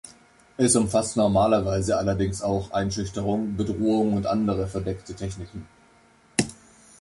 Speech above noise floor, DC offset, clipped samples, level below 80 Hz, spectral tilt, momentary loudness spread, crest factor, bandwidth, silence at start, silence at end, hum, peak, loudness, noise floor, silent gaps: 33 dB; under 0.1%; under 0.1%; -44 dBFS; -5.5 dB/octave; 13 LU; 20 dB; 11.5 kHz; 0.05 s; 0.45 s; none; -4 dBFS; -24 LUFS; -57 dBFS; none